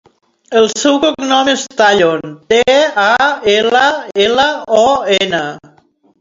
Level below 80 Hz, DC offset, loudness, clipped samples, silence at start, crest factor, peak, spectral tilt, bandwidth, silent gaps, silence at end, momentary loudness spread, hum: -50 dBFS; under 0.1%; -12 LUFS; under 0.1%; 0.5 s; 12 dB; 0 dBFS; -2.5 dB/octave; 7.8 kHz; none; 0.65 s; 5 LU; none